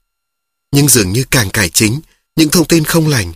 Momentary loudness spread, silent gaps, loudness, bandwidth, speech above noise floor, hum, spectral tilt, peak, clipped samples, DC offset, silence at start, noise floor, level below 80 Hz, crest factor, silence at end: 7 LU; none; -11 LUFS; over 20 kHz; 64 dB; none; -4 dB/octave; 0 dBFS; 0.1%; under 0.1%; 0.7 s; -75 dBFS; -36 dBFS; 12 dB; 0 s